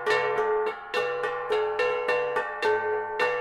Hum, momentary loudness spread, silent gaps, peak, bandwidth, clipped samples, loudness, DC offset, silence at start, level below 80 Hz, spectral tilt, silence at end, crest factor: none; 4 LU; none; -12 dBFS; 12.5 kHz; under 0.1%; -27 LUFS; under 0.1%; 0 s; -64 dBFS; -3 dB/octave; 0 s; 14 dB